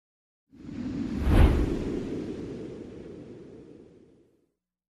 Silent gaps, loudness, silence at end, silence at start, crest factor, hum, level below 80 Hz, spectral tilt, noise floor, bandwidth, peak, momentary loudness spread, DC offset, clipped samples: none; -29 LUFS; 1.05 s; 0.55 s; 22 dB; none; -32 dBFS; -8 dB/octave; -76 dBFS; 13.5 kHz; -8 dBFS; 25 LU; under 0.1%; under 0.1%